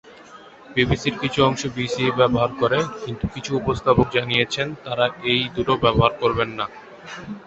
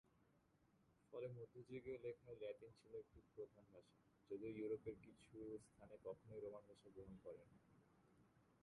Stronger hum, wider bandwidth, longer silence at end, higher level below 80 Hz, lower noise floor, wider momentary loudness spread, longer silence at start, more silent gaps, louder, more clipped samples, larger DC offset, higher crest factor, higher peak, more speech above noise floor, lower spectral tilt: neither; second, 8.2 kHz vs 11 kHz; about the same, 0 s vs 0.05 s; first, -42 dBFS vs -80 dBFS; second, -44 dBFS vs -79 dBFS; about the same, 10 LU vs 12 LU; about the same, 0.05 s vs 0.05 s; neither; first, -21 LUFS vs -57 LUFS; neither; neither; about the same, 20 dB vs 18 dB; first, -2 dBFS vs -38 dBFS; about the same, 23 dB vs 23 dB; second, -5.5 dB/octave vs -7.5 dB/octave